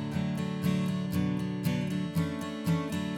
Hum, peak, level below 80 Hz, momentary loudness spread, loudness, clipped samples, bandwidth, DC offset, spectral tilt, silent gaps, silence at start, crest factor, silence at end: none; -18 dBFS; -58 dBFS; 2 LU; -31 LUFS; under 0.1%; 17.5 kHz; under 0.1%; -7 dB/octave; none; 0 s; 14 dB; 0 s